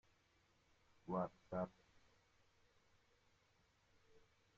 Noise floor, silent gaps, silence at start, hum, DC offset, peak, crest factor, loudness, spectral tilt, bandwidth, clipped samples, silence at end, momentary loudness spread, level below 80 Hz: -78 dBFS; none; 1.05 s; none; under 0.1%; -30 dBFS; 24 dB; -47 LUFS; -8 dB/octave; 7.4 kHz; under 0.1%; 0.4 s; 7 LU; -80 dBFS